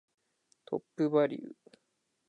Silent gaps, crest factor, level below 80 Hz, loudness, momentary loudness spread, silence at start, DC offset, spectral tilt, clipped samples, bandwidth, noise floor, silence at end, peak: none; 20 dB; -88 dBFS; -32 LUFS; 16 LU; 0.7 s; under 0.1%; -8 dB/octave; under 0.1%; 8.6 kHz; -80 dBFS; 0.8 s; -16 dBFS